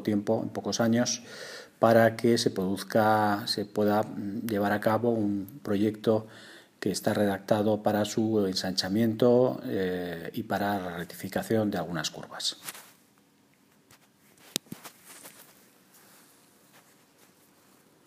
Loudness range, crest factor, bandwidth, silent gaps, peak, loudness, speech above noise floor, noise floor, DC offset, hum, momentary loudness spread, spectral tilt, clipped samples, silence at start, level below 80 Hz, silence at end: 17 LU; 28 dB; 15.5 kHz; none; -2 dBFS; -28 LUFS; 36 dB; -63 dBFS; under 0.1%; none; 17 LU; -5 dB/octave; under 0.1%; 0 s; -70 dBFS; 2.65 s